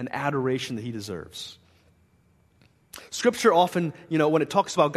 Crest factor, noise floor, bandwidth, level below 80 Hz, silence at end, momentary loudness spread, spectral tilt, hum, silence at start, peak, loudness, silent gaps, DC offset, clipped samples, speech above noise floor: 20 dB; -62 dBFS; 13.5 kHz; -66 dBFS; 0 s; 18 LU; -5 dB/octave; none; 0 s; -6 dBFS; -25 LUFS; none; under 0.1%; under 0.1%; 38 dB